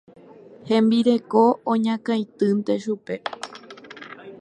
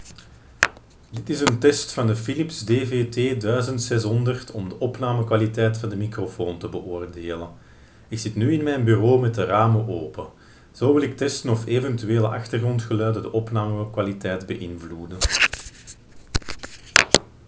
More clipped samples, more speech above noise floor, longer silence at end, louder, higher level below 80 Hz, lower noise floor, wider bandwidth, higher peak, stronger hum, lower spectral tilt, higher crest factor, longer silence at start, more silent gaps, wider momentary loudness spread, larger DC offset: neither; about the same, 25 dB vs 24 dB; second, 0.05 s vs 0.2 s; about the same, -22 LUFS vs -23 LUFS; second, -74 dBFS vs -42 dBFS; about the same, -46 dBFS vs -47 dBFS; first, 9.6 kHz vs 8 kHz; second, -4 dBFS vs 0 dBFS; neither; first, -6.5 dB/octave vs -5 dB/octave; about the same, 18 dB vs 22 dB; first, 0.65 s vs 0 s; neither; first, 21 LU vs 15 LU; neither